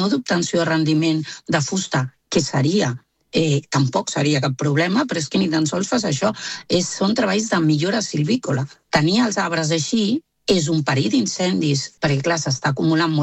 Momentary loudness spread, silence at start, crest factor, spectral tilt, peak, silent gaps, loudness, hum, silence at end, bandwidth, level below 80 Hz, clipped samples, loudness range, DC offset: 4 LU; 0 s; 16 dB; -5 dB/octave; -4 dBFS; none; -20 LUFS; none; 0 s; 8.8 kHz; -56 dBFS; under 0.1%; 1 LU; under 0.1%